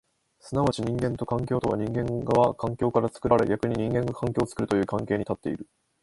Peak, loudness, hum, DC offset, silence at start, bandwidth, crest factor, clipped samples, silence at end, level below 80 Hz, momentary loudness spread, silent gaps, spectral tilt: -6 dBFS; -26 LUFS; none; under 0.1%; 0.45 s; 11.5 kHz; 20 dB; under 0.1%; 0.4 s; -50 dBFS; 6 LU; none; -7.5 dB/octave